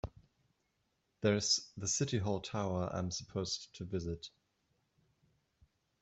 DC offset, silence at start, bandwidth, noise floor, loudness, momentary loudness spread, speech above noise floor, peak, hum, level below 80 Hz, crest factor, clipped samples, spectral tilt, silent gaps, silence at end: under 0.1%; 0.05 s; 8.2 kHz; -81 dBFS; -36 LUFS; 11 LU; 44 dB; -18 dBFS; none; -62 dBFS; 22 dB; under 0.1%; -4 dB/octave; none; 1.75 s